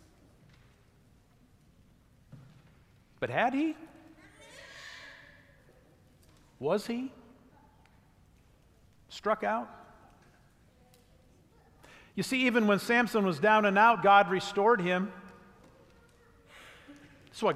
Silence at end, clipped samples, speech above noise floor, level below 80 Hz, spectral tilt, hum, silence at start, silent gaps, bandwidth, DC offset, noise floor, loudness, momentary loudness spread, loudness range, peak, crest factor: 0 s; under 0.1%; 36 dB; -68 dBFS; -5 dB/octave; none; 3.2 s; none; 15.5 kHz; under 0.1%; -63 dBFS; -27 LUFS; 26 LU; 14 LU; -10 dBFS; 22 dB